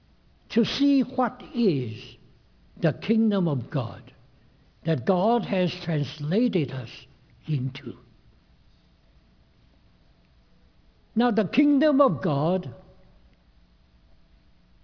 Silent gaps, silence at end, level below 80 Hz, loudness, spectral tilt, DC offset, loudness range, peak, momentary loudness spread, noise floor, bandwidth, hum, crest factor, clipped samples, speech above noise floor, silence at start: none; 2.05 s; -60 dBFS; -25 LUFS; -8 dB/octave; under 0.1%; 11 LU; -8 dBFS; 19 LU; -59 dBFS; 5.4 kHz; none; 20 dB; under 0.1%; 35 dB; 0.5 s